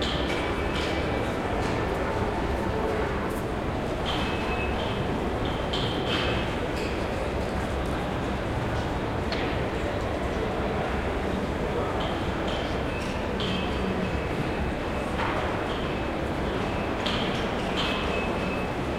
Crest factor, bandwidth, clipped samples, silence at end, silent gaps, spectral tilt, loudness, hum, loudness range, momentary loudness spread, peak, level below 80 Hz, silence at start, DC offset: 16 dB; 16 kHz; under 0.1%; 0 s; none; -6 dB/octave; -28 LUFS; none; 1 LU; 3 LU; -12 dBFS; -36 dBFS; 0 s; under 0.1%